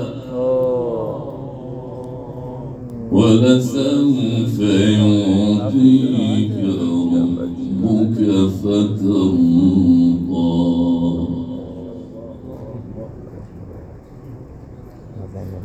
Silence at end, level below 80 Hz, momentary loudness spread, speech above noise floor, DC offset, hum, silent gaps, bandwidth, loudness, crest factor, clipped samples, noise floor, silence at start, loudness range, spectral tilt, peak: 0 s; -44 dBFS; 21 LU; 23 dB; under 0.1%; none; none; 8.6 kHz; -16 LUFS; 16 dB; under 0.1%; -36 dBFS; 0 s; 17 LU; -7.5 dB/octave; 0 dBFS